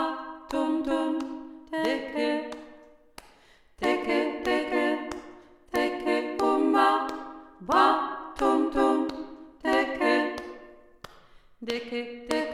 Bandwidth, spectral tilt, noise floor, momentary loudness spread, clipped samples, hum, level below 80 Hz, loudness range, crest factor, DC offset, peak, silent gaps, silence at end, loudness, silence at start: 13.5 kHz; -4 dB/octave; -58 dBFS; 17 LU; under 0.1%; none; -56 dBFS; 6 LU; 20 dB; under 0.1%; -8 dBFS; none; 0 s; -27 LUFS; 0 s